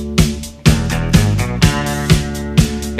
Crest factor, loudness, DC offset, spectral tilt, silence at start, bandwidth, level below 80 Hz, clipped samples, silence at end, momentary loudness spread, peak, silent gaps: 14 dB; -15 LUFS; under 0.1%; -5 dB/octave; 0 s; 14.5 kHz; -22 dBFS; 0.2%; 0 s; 3 LU; 0 dBFS; none